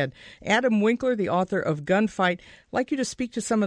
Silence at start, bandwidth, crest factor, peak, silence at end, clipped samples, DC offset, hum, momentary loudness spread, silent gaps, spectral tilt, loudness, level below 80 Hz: 0 s; 10.5 kHz; 16 dB; -8 dBFS; 0 s; under 0.1%; under 0.1%; none; 9 LU; none; -5 dB/octave; -25 LUFS; -58 dBFS